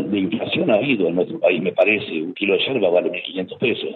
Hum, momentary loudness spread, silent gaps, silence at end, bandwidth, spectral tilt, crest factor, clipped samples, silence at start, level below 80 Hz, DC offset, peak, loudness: none; 6 LU; none; 0 s; 4.5 kHz; -8.5 dB/octave; 16 dB; under 0.1%; 0 s; -66 dBFS; under 0.1%; -4 dBFS; -19 LUFS